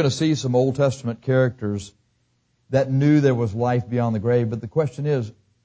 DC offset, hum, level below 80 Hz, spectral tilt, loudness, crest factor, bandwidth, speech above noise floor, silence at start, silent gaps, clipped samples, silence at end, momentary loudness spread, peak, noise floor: under 0.1%; none; -52 dBFS; -7 dB/octave; -21 LUFS; 16 dB; 8 kHz; 46 dB; 0 s; none; under 0.1%; 0.35 s; 10 LU; -6 dBFS; -67 dBFS